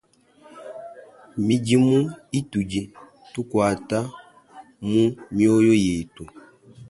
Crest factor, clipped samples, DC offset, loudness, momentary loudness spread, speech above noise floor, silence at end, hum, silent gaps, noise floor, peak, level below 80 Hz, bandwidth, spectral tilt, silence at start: 16 dB; under 0.1%; under 0.1%; -22 LUFS; 22 LU; 32 dB; 0.05 s; none; none; -53 dBFS; -6 dBFS; -52 dBFS; 11.5 kHz; -6.5 dB/octave; 0.55 s